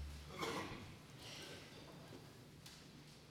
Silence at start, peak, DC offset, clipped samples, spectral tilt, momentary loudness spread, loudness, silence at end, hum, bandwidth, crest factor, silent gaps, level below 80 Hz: 0 s; -28 dBFS; under 0.1%; under 0.1%; -4 dB/octave; 13 LU; -52 LUFS; 0 s; none; 17 kHz; 24 dB; none; -64 dBFS